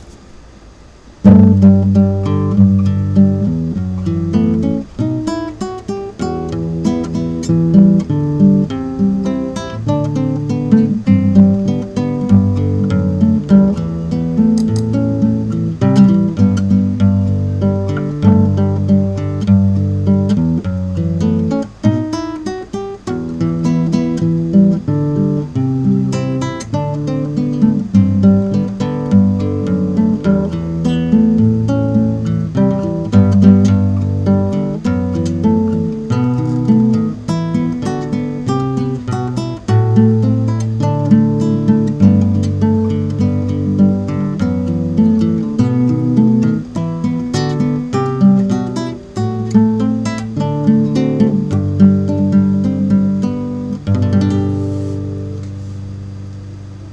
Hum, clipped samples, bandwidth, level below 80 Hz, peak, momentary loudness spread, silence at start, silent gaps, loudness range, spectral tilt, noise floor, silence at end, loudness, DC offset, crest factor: none; 0.2%; 8.6 kHz; -40 dBFS; 0 dBFS; 9 LU; 0 s; none; 4 LU; -9 dB/octave; -39 dBFS; 0 s; -14 LUFS; under 0.1%; 14 dB